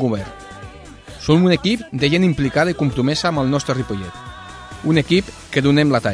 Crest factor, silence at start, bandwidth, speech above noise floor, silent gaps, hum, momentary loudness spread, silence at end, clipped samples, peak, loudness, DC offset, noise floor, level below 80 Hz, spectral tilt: 16 dB; 0 s; 10.5 kHz; 21 dB; none; none; 20 LU; 0 s; under 0.1%; -2 dBFS; -18 LUFS; under 0.1%; -38 dBFS; -42 dBFS; -6 dB/octave